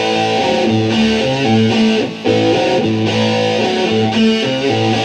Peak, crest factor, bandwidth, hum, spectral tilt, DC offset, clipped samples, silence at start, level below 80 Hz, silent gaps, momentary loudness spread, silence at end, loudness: -2 dBFS; 12 dB; 9.6 kHz; none; -5.5 dB/octave; under 0.1%; under 0.1%; 0 s; -46 dBFS; none; 2 LU; 0 s; -14 LUFS